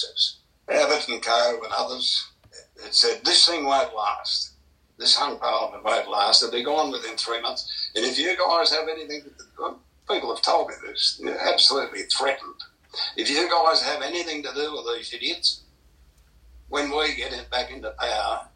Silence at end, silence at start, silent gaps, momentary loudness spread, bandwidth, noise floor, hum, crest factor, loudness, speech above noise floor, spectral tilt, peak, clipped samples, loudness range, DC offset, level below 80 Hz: 0.1 s; 0 s; none; 13 LU; 11 kHz; -57 dBFS; none; 22 dB; -22 LUFS; 33 dB; -0.5 dB/octave; -4 dBFS; under 0.1%; 6 LU; under 0.1%; -56 dBFS